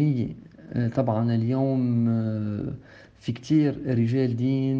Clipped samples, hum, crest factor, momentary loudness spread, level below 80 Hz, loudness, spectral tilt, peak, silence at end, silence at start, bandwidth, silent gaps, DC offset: under 0.1%; none; 14 dB; 11 LU; -58 dBFS; -25 LUFS; -9 dB/octave; -10 dBFS; 0 s; 0 s; 7.2 kHz; none; under 0.1%